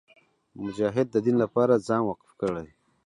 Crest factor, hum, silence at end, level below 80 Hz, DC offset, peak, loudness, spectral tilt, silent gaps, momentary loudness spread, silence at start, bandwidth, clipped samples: 18 dB; none; 0.4 s; -62 dBFS; under 0.1%; -8 dBFS; -26 LUFS; -7.5 dB/octave; none; 13 LU; 0.55 s; 11 kHz; under 0.1%